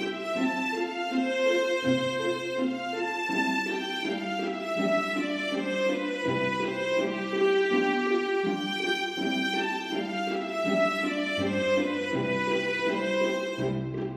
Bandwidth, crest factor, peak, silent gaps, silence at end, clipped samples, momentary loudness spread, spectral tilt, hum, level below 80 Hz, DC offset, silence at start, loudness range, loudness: 14 kHz; 14 dB; -14 dBFS; none; 0 s; under 0.1%; 5 LU; -5 dB/octave; none; -66 dBFS; under 0.1%; 0 s; 2 LU; -28 LUFS